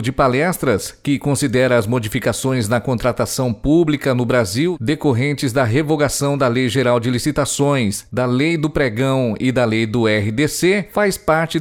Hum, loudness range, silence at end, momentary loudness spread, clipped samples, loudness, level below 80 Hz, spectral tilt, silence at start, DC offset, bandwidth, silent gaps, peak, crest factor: none; 1 LU; 0 s; 4 LU; under 0.1%; -17 LUFS; -40 dBFS; -5.5 dB/octave; 0 s; under 0.1%; 17.5 kHz; none; -2 dBFS; 14 dB